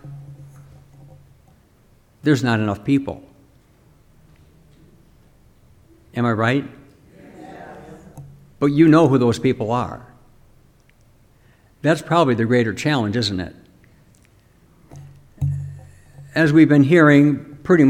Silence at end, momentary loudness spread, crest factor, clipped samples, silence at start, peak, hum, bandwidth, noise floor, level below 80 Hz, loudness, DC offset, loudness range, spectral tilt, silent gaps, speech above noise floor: 0 s; 26 LU; 18 dB; under 0.1%; 0.05 s; -2 dBFS; none; 11.5 kHz; -54 dBFS; -52 dBFS; -17 LUFS; under 0.1%; 8 LU; -7 dB/octave; none; 38 dB